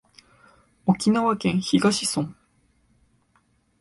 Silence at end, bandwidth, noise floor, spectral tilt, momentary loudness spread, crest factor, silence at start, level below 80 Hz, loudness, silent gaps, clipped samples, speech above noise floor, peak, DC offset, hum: 1.5 s; 11.5 kHz; -65 dBFS; -5 dB/octave; 9 LU; 18 dB; 0.85 s; -60 dBFS; -23 LUFS; none; under 0.1%; 44 dB; -6 dBFS; under 0.1%; none